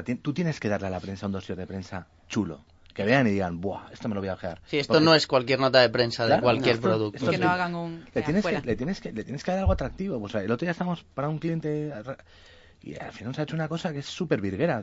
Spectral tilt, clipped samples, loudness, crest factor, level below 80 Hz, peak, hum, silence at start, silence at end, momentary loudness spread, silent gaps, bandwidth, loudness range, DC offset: -6 dB/octave; under 0.1%; -26 LUFS; 22 dB; -46 dBFS; -6 dBFS; none; 0 s; 0 s; 14 LU; none; 8 kHz; 9 LU; under 0.1%